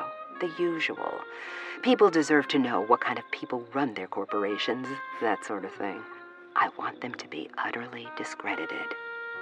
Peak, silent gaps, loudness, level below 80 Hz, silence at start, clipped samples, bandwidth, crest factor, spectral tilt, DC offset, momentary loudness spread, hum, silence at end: -8 dBFS; none; -29 LUFS; -86 dBFS; 0 s; under 0.1%; 10 kHz; 22 dB; -4.5 dB/octave; under 0.1%; 13 LU; none; 0 s